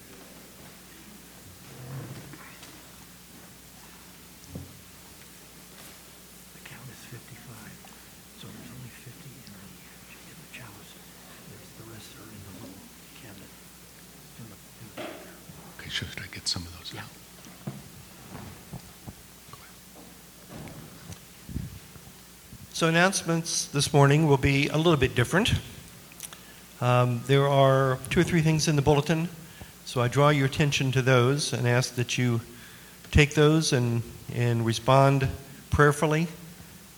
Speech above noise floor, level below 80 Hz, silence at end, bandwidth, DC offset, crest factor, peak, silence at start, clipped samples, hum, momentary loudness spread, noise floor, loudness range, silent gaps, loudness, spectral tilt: 26 dB; -48 dBFS; 0.2 s; over 20 kHz; under 0.1%; 24 dB; -4 dBFS; 0.1 s; under 0.1%; none; 25 LU; -49 dBFS; 21 LU; none; -24 LUFS; -5 dB/octave